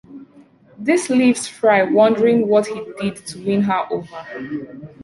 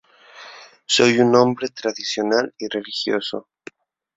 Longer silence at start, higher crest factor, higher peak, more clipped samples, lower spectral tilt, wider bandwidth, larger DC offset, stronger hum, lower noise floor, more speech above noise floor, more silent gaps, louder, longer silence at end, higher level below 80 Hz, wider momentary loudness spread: second, 0.1 s vs 0.35 s; about the same, 16 dB vs 20 dB; about the same, -2 dBFS vs -2 dBFS; neither; first, -5.5 dB/octave vs -4 dB/octave; first, 11.5 kHz vs 8 kHz; neither; neither; first, -48 dBFS vs -44 dBFS; first, 31 dB vs 25 dB; neither; about the same, -18 LUFS vs -19 LUFS; second, 0 s vs 0.75 s; about the same, -60 dBFS vs -64 dBFS; second, 15 LU vs 24 LU